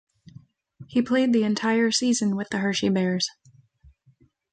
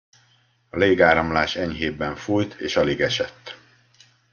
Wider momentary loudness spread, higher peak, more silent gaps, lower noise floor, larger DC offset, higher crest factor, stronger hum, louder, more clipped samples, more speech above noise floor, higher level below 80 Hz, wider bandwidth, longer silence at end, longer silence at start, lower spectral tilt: second, 6 LU vs 14 LU; second, -10 dBFS vs -2 dBFS; neither; about the same, -61 dBFS vs -61 dBFS; neither; second, 14 dB vs 20 dB; neither; about the same, -23 LUFS vs -21 LUFS; neither; about the same, 38 dB vs 40 dB; second, -64 dBFS vs -50 dBFS; first, 9.4 kHz vs 7.2 kHz; first, 1.2 s vs 0.75 s; about the same, 0.8 s vs 0.75 s; about the same, -4.5 dB/octave vs -5 dB/octave